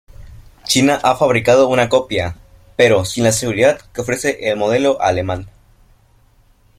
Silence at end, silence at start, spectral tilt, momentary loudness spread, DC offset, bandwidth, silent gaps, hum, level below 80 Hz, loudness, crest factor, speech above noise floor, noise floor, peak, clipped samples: 1.3 s; 0.2 s; -4 dB/octave; 11 LU; under 0.1%; 16 kHz; none; none; -44 dBFS; -15 LUFS; 16 dB; 37 dB; -52 dBFS; 0 dBFS; under 0.1%